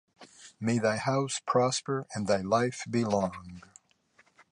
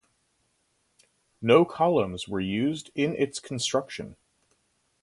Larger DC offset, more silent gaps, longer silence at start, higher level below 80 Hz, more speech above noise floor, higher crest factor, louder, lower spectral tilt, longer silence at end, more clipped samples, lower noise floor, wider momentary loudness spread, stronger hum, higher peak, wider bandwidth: neither; neither; second, 0.2 s vs 1.4 s; about the same, -62 dBFS vs -60 dBFS; second, 37 dB vs 46 dB; about the same, 18 dB vs 22 dB; second, -29 LUFS vs -26 LUFS; about the same, -5 dB/octave vs -5 dB/octave; about the same, 0.9 s vs 0.9 s; neither; second, -66 dBFS vs -72 dBFS; first, 20 LU vs 12 LU; neither; second, -12 dBFS vs -6 dBFS; about the same, 11 kHz vs 11.5 kHz